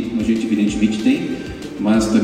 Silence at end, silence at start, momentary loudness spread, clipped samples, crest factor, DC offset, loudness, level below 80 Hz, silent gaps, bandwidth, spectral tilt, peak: 0 s; 0 s; 10 LU; under 0.1%; 14 dB; under 0.1%; -18 LUFS; -40 dBFS; none; 12.5 kHz; -5.5 dB/octave; -4 dBFS